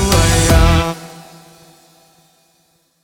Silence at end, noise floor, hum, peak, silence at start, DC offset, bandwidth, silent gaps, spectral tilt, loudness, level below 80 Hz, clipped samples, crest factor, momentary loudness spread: 1.85 s; -59 dBFS; none; 0 dBFS; 0 s; under 0.1%; 19 kHz; none; -4.5 dB/octave; -13 LUFS; -20 dBFS; under 0.1%; 16 dB; 19 LU